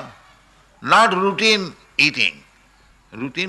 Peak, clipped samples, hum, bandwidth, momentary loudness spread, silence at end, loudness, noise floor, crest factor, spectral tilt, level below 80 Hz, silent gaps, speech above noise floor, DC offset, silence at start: -4 dBFS; under 0.1%; none; 12 kHz; 14 LU; 0 s; -17 LUFS; -53 dBFS; 18 dB; -3 dB/octave; -58 dBFS; none; 35 dB; under 0.1%; 0 s